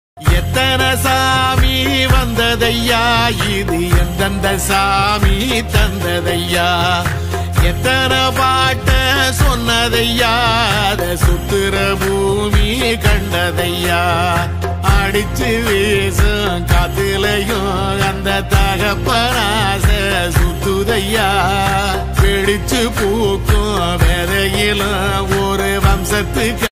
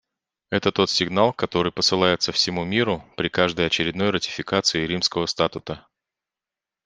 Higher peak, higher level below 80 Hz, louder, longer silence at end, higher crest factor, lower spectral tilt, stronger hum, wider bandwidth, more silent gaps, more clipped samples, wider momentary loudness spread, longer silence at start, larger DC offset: about the same, 0 dBFS vs -2 dBFS; first, -20 dBFS vs -54 dBFS; first, -14 LUFS vs -22 LUFS; second, 0.05 s vs 1.05 s; second, 14 dB vs 22 dB; about the same, -4.5 dB/octave vs -4 dB/octave; neither; first, 16 kHz vs 10 kHz; neither; neither; about the same, 4 LU vs 6 LU; second, 0.15 s vs 0.5 s; neither